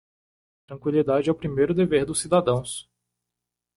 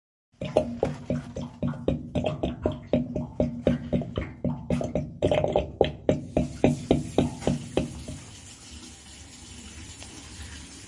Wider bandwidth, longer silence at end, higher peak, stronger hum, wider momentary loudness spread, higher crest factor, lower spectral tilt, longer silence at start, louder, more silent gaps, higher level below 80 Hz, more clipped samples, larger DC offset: about the same, 11.5 kHz vs 11.5 kHz; first, 0.95 s vs 0 s; second, -8 dBFS vs -4 dBFS; first, 60 Hz at -40 dBFS vs none; second, 12 LU vs 18 LU; second, 18 dB vs 26 dB; about the same, -5.5 dB/octave vs -6.5 dB/octave; first, 0.7 s vs 0.4 s; first, -23 LUFS vs -28 LUFS; neither; second, -54 dBFS vs -44 dBFS; neither; neither